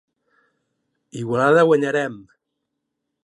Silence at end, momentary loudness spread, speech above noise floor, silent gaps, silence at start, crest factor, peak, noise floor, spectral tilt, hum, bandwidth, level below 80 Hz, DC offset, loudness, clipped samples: 1.05 s; 16 LU; 60 dB; none; 1.15 s; 18 dB; -4 dBFS; -78 dBFS; -6.5 dB/octave; none; 11.5 kHz; -70 dBFS; under 0.1%; -18 LUFS; under 0.1%